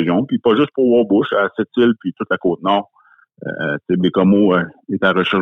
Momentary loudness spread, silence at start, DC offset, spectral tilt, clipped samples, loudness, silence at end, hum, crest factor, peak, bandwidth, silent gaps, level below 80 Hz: 9 LU; 0 s; under 0.1%; -8.5 dB/octave; under 0.1%; -16 LUFS; 0 s; none; 16 dB; -2 dBFS; 4 kHz; none; -58 dBFS